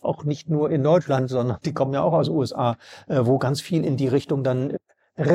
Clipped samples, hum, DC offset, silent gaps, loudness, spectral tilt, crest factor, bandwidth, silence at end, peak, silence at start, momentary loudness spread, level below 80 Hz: under 0.1%; none; under 0.1%; none; -23 LUFS; -7.5 dB/octave; 16 dB; 13 kHz; 0 s; -6 dBFS; 0.05 s; 7 LU; -62 dBFS